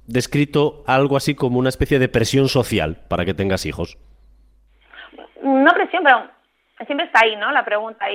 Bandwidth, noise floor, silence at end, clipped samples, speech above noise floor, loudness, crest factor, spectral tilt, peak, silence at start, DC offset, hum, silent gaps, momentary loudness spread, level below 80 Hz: 16 kHz; -54 dBFS; 0 s; under 0.1%; 36 dB; -18 LUFS; 18 dB; -5.5 dB/octave; 0 dBFS; 0.1 s; under 0.1%; none; none; 9 LU; -42 dBFS